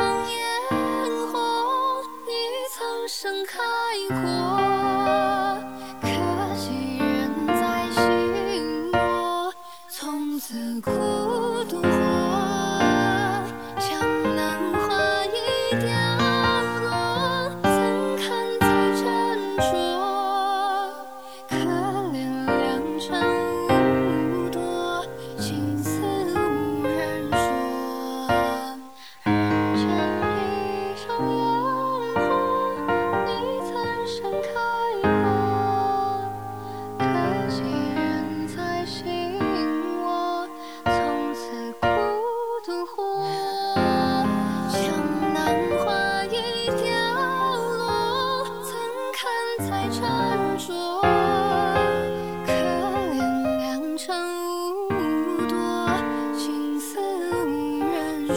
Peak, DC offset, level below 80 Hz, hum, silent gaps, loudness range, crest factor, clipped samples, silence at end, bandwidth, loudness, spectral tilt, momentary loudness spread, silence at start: -6 dBFS; 0.4%; -52 dBFS; none; none; 3 LU; 18 dB; under 0.1%; 0 s; over 20 kHz; -24 LUFS; -5 dB/octave; 7 LU; 0 s